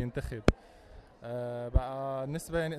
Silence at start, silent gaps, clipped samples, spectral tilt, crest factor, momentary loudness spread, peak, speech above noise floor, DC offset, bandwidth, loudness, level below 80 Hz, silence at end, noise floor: 0 s; none; under 0.1%; -6.5 dB/octave; 26 dB; 11 LU; -8 dBFS; 21 dB; under 0.1%; 13.5 kHz; -34 LUFS; -38 dBFS; 0 s; -54 dBFS